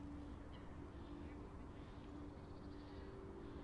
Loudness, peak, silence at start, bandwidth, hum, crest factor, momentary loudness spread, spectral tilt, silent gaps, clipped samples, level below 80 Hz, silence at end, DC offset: -55 LUFS; -40 dBFS; 0 s; 10.5 kHz; none; 12 dB; 2 LU; -7.5 dB/octave; none; under 0.1%; -58 dBFS; 0 s; under 0.1%